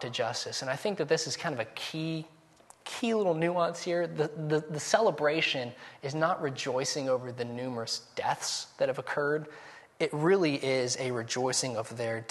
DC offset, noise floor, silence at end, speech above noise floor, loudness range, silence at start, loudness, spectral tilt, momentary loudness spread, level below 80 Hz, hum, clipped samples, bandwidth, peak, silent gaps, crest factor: under 0.1%; -59 dBFS; 0 s; 28 dB; 3 LU; 0 s; -31 LUFS; -4 dB/octave; 9 LU; -76 dBFS; none; under 0.1%; 12.5 kHz; -10 dBFS; none; 22 dB